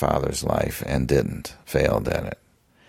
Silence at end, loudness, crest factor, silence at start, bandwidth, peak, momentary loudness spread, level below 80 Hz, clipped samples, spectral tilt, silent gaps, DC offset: 0.55 s; -24 LUFS; 20 dB; 0 s; 16.5 kHz; -4 dBFS; 12 LU; -36 dBFS; under 0.1%; -5.5 dB/octave; none; under 0.1%